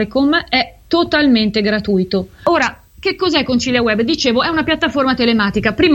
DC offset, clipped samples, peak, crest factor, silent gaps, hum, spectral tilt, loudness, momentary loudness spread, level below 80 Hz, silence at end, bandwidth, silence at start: under 0.1%; under 0.1%; 0 dBFS; 14 dB; none; none; -5 dB/octave; -15 LUFS; 5 LU; -40 dBFS; 0 s; 16.5 kHz; 0 s